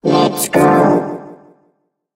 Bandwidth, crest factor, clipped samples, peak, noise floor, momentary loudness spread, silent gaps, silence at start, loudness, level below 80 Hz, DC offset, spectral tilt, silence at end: 16 kHz; 14 dB; under 0.1%; 0 dBFS; -63 dBFS; 15 LU; none; 0.05 s; -13 LUFS; -54 dBFS; under 0.1%; -5 dB/octave; 0.8 s